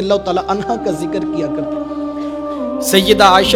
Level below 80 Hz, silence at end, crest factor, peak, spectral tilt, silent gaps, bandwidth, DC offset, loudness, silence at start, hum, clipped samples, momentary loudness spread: -40 dBFS; 0 s; 14 dB; 0 dBFS; -4 dB/octave; none; 18 kHz; under 0.1%; -16 LUFS; 0 s; none; under 0.1%; 14 LU